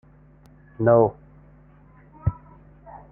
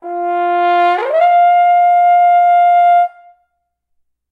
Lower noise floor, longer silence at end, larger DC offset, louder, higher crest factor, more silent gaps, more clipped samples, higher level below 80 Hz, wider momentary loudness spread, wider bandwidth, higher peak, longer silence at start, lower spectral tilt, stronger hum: second, -52 dBFS vs -69 dBFS; second, 0.15 s vs 1.25 s; neither; second, -22 LUFS vs -11 LUFS; first, 22 dB vs 10 dB; neither; neither; first, -46 dBFS vs -80 dBFS; first, 28 LU vs 6 LU; second, 2.7 kHz vs 4.8 kHz; about the same, -4 dBFS vs -2 dBFS; first, 0.8 s vs 0.05 s; first, -13 dB/octave vs -2.5 dB/octave; neither